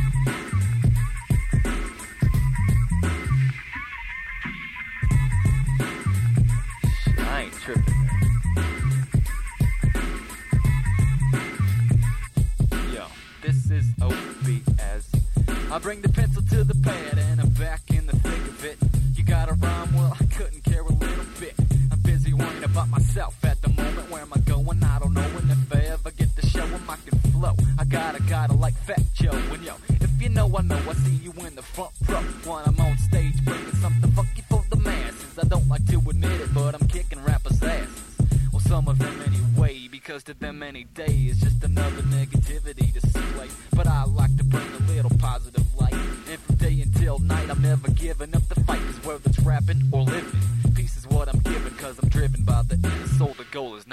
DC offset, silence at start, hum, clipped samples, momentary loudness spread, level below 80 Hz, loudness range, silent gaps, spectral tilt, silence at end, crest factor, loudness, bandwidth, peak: under 0.1%; 0 s; none; under 0.1%; 10 LU; -28 dBFS; 2 LU; none; -6.5 dB/octave; 0 s; 14 dB; -23 LUFS; 14.5 kHz; -8 dBFS